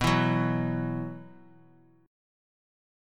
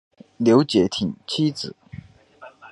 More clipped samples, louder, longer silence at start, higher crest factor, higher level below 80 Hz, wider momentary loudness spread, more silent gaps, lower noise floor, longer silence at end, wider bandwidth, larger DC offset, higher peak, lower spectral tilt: neither; second, -29 LUFS vs -21 LUFS; second, 0 s vs 0.4 s; about the same, 20 dB vs 20 dB; about the same, -52 dBFS vs -54 dBFS; second, 15 LU vs 25 LU; neither; first, -59 dBFS vs -47 dBFS; first, 1.75 s vs 0.05 s; first, 14.5 kHz vs 11.5 kHz; neither; second, -10 dBFS vs -2 dBFS; about the same, -6.5 dB/octave vs -6 dB/octave